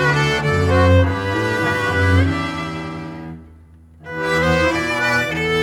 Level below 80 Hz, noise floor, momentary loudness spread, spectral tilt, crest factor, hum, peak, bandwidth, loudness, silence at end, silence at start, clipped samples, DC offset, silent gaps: -36 dBFS; -44 dBFS; 15 LU; -6 dB/octave; 16 dB; none; -2 dBFS; 15 kHz; -17 LUFS; 0 s; 0 s; under 0.1%; under 0.1%; none